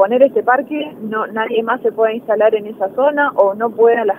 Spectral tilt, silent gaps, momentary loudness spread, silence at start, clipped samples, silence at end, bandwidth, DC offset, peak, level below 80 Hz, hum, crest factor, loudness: -7 dB/octave; none; 9 LU; 0 s; under 0.1%; 0 s; 13 kHz; under 0.1%; 0 dBFS; -68 dBFS; none; 14 dB; -16 LUFS